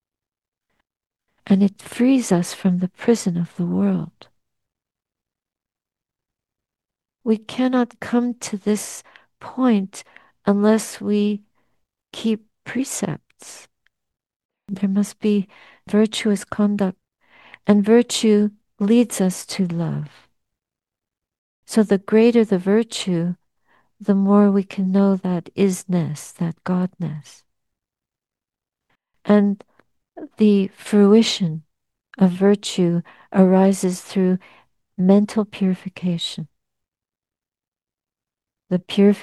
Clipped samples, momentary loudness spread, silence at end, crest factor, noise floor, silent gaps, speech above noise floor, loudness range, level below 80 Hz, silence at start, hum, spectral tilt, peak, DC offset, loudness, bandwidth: under 0.1%; 15 LU; 0 s; 20 dB; under -90 dBFS; 14.36-14.49 s, 21.38-21.63 s, 37.68-37.72 s; over 71 dB; 9 LU; -66 dBFS; 1.45 s; none; -6 dB/octave; -2 dBFS; under 0.1%; -20 LUFS; 12.5 kHz